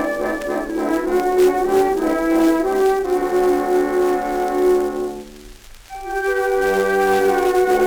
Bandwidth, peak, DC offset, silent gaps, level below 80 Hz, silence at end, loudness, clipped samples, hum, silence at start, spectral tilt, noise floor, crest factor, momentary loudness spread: over 20 kHz; -6 dBFS; under 0.1%; none; -42 dBFS; 0 s; -18 LUFS; under 0.1%; none; 0 s; -4.5 dB/octave; -40 dBFS; 12 dB; 7 LU